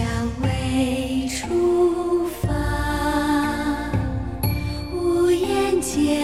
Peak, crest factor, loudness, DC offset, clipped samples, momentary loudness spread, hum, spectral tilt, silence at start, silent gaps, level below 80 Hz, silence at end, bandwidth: -8 dBFS; 12 dB; -22 LUFS; 0.4%; under 0.1%; 6 LU; none; -5.5 dB/octave; 0 s; none; -32 dBFS; 0 s; 15.5 kHz